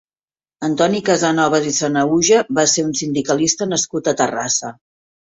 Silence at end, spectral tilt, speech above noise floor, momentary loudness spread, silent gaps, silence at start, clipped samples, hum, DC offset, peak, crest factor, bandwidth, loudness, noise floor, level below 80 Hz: 0.45 s; -3 dB/octave; over 73 dB; 6 LU; none; 0.6 s; under 0.1%; none; under 0.1%; -2 dBFS; 16 dB; 8.4 kHz; -17 LUFS; under -90 dBFS; -58 dBFS